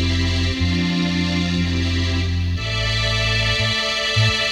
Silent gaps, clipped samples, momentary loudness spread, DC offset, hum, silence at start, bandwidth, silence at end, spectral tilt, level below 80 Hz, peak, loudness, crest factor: none; under 0.1%; 4 LU; under 0.1%; none; 0 s; 11.5 kHz; 0 s; -4.5 dB/octave; -30 dBFS; -6 dBFS; -19 LUFS; 14 dB